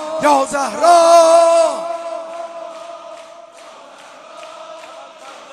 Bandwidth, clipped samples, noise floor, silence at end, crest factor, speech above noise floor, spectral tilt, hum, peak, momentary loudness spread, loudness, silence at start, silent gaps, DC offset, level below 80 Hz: 14.5 kHz; under 0.1%; -39 dBFS; 0.15 s; 16 dB; 28 dB; -2 dB/octave; none; 0 dBFS; 27 LU; -12 LUFS; 0 s; none; under 0.1%; -62 dBFS